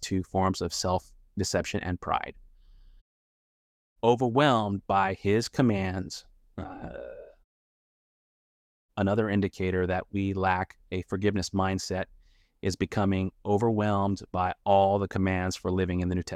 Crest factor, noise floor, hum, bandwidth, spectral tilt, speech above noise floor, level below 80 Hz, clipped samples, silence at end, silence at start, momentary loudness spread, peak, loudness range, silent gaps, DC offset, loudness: 20 dB; -54 dBFS; none; 14.5 kHz; -6 dB/octave; 27 dB; -54 dBFS; under 0.1%; 0 s; 0 s; 16 LU; -8 dBFS; 7 LU; 3.01-3.96 s, 7.44-8.89 s; under 0.1%; -28 LUFS